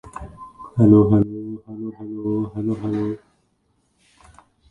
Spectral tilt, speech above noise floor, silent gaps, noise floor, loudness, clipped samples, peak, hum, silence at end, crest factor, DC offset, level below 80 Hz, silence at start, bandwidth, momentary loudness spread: -11 dB/octave; 48 dB; none; -66 dBFS; -20 LUFS; under 0.1%; -2 dBFS; none; 1.55 s; 20 dB; under 0.1%; -48 dBFS; 0.05 s; 9.2 kHz; 23 LU